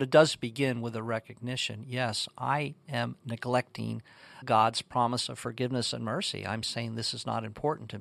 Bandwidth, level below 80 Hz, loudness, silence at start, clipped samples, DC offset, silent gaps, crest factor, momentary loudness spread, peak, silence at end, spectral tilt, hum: 14 kHz; -68 dBFS; -31 LUFS; 0 s; under 0.1%; under 0.1%; none; 24 dB; 10 LU; -8 dBFS; 0 s; -4.5 dB/octave; none